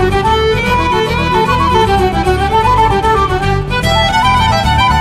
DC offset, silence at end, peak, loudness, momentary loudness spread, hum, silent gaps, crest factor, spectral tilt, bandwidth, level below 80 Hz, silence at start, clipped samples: under 0.1%; 0 s; 0 dBFS; -11 LUFS; 3 LU; none; none; 10 dB; -5.5 dB/octave; 13.5 kHz; -22 dBFS; 0 s; under 0.1%